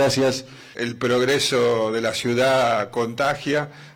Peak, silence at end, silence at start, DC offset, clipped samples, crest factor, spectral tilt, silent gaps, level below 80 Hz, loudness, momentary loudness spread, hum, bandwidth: -8 dBFS; 0.05 s; 0 s; under 0.1%; under 0.1%; 14 dB; -4 dB/octave; none; -58 dBFS; -21 LUFS; 9 LU; none; 18.5 kHz